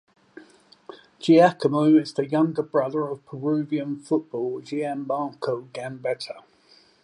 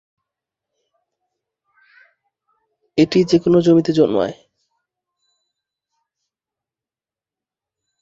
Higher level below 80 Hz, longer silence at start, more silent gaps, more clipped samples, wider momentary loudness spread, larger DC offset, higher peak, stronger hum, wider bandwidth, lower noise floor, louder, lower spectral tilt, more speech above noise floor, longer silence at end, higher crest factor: second, -76 dBFS vs -58 dBFS; second, 0.35 s vs 2.95 s; neither; neither; first, 13 LU vs 9 LU; neither; second, -6 dBFS vs -2 dBFS; neither; first, 10.5 kHz vs 7.8 kHz; second, -57 dBFS vs under -90 dBFS; second, -24 LUFS vs -16 LUFS; about the same, -7 dB/octave vs -7 dB/octave; second, 34 dB vs over 76 dB; second, 0.65 s vs 3.7 s; about the same, 18 dB vs 20 dB